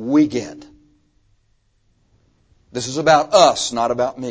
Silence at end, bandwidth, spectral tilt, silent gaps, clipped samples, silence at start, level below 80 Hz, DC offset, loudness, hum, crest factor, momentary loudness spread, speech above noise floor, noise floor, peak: 0 s; 8 kHz; -4 dB/octave; none; under 0.1%; 0 s; -56 dBFS; under 0.1%; -17 LUFS; none; 20 dB; 14 LU; 45 dB; -62 dBFS; 0 dBFS